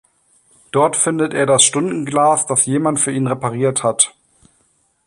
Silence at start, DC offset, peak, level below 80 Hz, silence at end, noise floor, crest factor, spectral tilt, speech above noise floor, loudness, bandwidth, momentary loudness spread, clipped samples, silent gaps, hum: 0.75 s; under 0.1%; 0 dBFS; -60 dBFS; 0.95 s; -61 dBFS; 18 dB; -3.5 dB/octave; 45 dB; -15 LUFS; 15 kHz; 7 LU; under 0.1%; none; none